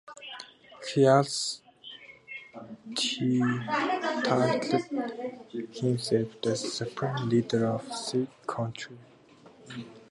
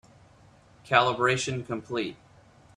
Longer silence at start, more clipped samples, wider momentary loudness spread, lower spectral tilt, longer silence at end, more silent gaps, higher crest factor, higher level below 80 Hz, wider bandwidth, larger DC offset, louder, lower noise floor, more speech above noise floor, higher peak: second, 0.05 s vs 0.85 s; neither; first, 18 LU vs 11 LU; about the same, -5 dB/octave vs -4 dB/octave; second, 0.05 s vs 0.65 s; neither; about the same, 22 dB vs 24 dB; second, -70 dBFS vs -62 dBFS; about the same, 11.5 kHz vs 12 kHz; neither; second, -29 LUFS vs -26 LUFS; about the same, -55 dBFS vs -56 dBFS; about the same, 27 dB vs 30 dB; about the same, -8 dBFS vs -6 dBFS